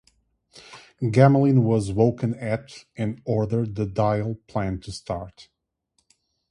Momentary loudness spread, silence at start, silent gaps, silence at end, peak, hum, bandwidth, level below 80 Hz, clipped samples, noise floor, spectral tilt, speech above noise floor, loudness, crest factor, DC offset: 15 LU; 0.55 s; none; 1.1 s; -2 dBFS; none; 11 kHz; -50 dBFS; under 0.1%; -72 dBFS; -8 dB/octave; 50 dB; -23 LUFS; 22 dB; under 0.1%